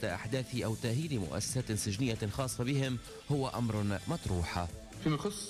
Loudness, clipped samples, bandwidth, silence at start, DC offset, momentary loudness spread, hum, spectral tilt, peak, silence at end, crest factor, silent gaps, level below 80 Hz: -35 LUFS; under 0.1%; 15.5 kHz; 0 s; under 0.1%; 4 LU; none; -5 dB/octave; -22 dBFS; 0 s; 12 dB; none; -52 dBFS